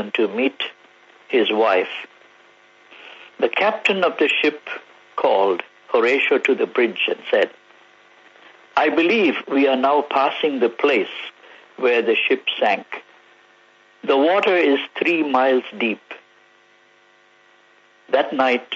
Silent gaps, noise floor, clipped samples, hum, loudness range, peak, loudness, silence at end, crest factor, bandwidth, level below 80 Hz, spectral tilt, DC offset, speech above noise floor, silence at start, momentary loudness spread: none; -54 dBFS; under 0.1%; none; 4 LU; -4 dBFS; -19 LUFS; 0 s; 16 dB; 8 kHz; -76 dBFS; -4.5 dB/octave; under 0.1%; 36 dB; 0 s; 16 LU